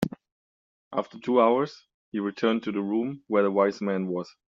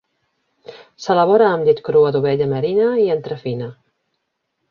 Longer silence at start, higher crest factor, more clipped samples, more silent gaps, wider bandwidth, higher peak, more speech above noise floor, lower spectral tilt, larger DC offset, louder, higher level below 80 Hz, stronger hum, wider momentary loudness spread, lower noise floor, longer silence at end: second, 0 s vs 0.7 s; about the same, 20 dB vs 16 dB; neither; first, 0.32-0.91 s, 1.94-2.12 s vs none; about the same, 7.6 kHz vs 7 kHz; second, -8 dBFS vs -2 dBFS; first, over 64 dB vs 57 dB; second, -5.5 dB/octave vs -7 dB/octave; neither; second, -27 LUFS vs -17 LUFS; second, -68 dBFS vs -60 dBFS; neither; about the same, 11 LU vs 13 LU; first, under -90 dBFS vs -73 dBFS; second, 0.3 s vs 1 s